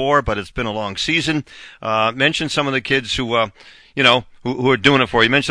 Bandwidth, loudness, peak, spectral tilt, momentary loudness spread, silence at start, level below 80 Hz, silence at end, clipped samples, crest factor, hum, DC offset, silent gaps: 10.5 kHz; -17 LUFS; 0 dBFS; -4.5 dB/octave; 10 LU; 0 s; -42 dBFS; 0 s; under 0.1%; 18 dB; none; under 0.1%; none